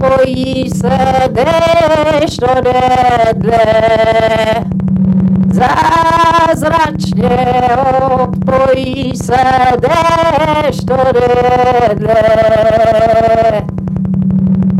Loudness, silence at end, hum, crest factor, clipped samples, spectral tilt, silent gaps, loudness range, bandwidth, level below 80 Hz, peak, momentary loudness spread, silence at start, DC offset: -10 LUFS; 0 s; none; 8 dB; under 0.1%; -6.5 dB/octave; none; 1 LU; 13.5 kHz; -30 dBFS; -2 dBFS; 5 LU; 0 s; under 0.1%